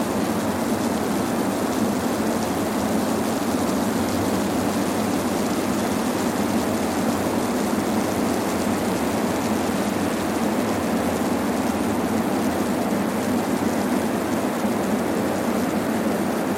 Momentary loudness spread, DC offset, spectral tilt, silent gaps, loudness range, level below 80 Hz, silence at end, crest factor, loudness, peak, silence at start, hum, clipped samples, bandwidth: 1 LU; under 0.1%; -5 dB/octave; none; 0 LU; -48 dBFS; 0 s; 14 dB; -23 LUFS; -10 dBFS; 0 s; none; under 0.1%; 16.5 kHz